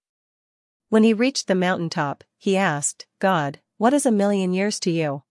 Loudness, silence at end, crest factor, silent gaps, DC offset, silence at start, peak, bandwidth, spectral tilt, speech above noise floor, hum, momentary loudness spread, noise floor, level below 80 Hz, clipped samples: -21 LUFS; 0.1 s; 18 dB; none; under 0.1%; 0.9 s; -4 dBFS; 12 kHz; -5 dB/octave; over 69 dB; none; 8 LU; under -90 dBFS; -74 dBFS; under 0.1%